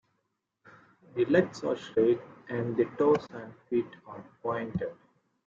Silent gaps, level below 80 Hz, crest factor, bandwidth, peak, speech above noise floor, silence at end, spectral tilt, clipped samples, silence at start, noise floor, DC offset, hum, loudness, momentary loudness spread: none; -68 dBFS; 20 dB; 7.4 kHz; -10 dBFS; 51 dB; 0.55 s; -7.5 dB/octave; under 0.1%; 1.15 s; -80 dBFS; under 0.1%; none; -30 LUFS; 16 LU